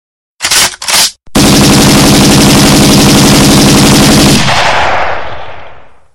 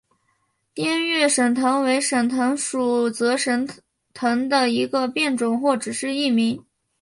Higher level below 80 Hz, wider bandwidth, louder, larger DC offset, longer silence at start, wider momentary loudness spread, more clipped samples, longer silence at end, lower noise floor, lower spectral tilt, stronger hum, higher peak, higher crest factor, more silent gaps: first, -24 dBFS vs -68 dBFS; first, 17.5 kHz vs 11.5 kHz; first, -5 LUFS vs -21 LUFS; neither; second, 0.3 s vs 0.75 s; about the same, 9 LU vs 7 LU; first, 0.5% vs under 0.1%; second, 0 s vs 0.4 s; second, -32 dBFS vs -69 dBFS; about the same, -3.5 dB/octave vs -3 dB/octave; neither; first, 0 dBFS vs -6 dBFS; second, 6 dB vs 16 dB; neither